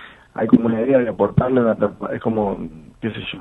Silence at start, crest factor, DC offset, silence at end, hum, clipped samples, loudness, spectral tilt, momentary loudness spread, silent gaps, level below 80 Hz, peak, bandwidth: 0 s; 20 dB; under 0.1%; 0 s; none; under 0.1%; -19 LUFS; -9.5 dB/octave; 13 LU; none; -46 dBFS; 0 dBFS; 4 kHz